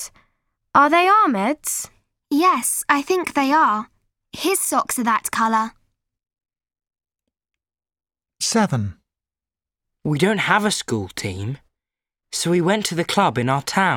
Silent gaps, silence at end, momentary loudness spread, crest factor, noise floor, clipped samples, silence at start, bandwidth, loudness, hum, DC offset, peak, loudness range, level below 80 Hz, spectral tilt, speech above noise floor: none; 0 s; 14 LU; 20 dB; under -90 dBFS; under 0.1%; 0 s; 17.5 kHz; -19 LUFS; none; under 0.1%; 0 dBFS; 9 LU; -58 dBFS; -4 dB/octave; over 71 dB